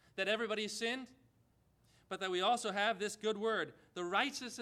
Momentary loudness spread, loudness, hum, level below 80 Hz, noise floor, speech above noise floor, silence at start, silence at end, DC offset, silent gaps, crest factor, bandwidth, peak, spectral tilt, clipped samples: 10 LU; -37 LUFS; none; -80 dBFS; -72 dBFS; 35 dB; 0.15 s; 0 s; under 0.1%; none; 20 dB; 15 kHz; -18 dBFS; -2.5 dB/octave; under 0.1%